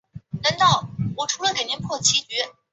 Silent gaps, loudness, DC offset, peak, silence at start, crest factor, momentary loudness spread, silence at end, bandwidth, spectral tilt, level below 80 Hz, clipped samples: none; -21 LUFS; under 0.1%; -4 dBFS; 0.15 s; 18 dB; 8 LU; 0.2 s; 8.4 kHz; -2 dB/octave; -54 dBFS; under 0.1%